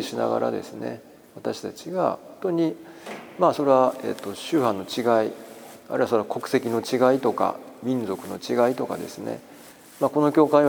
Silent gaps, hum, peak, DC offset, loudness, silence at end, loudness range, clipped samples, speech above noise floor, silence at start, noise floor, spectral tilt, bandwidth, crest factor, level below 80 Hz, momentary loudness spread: none; none; -4 dBFS; under 0.1%; -24 LUFS; 0 s; 3 LU; under 0.1%; 23 dB; 0 s; -47 dBFS; -6 dB/octave; over 20 kHz; 20 dB; -72 dBFS; 15 LU